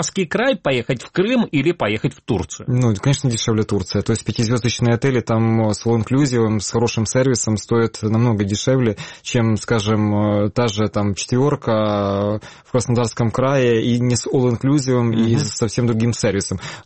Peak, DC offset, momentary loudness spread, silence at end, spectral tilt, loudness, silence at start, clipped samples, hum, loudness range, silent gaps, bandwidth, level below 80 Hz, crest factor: -4 dBFS; 0.2%; 4 LU; 0.05 s; -5.5 dB/octave; -18 LUFS; 0 s; under 0.1%; none; 2 LU; none; 8.8 kHz; -46 dBFS; 14 dB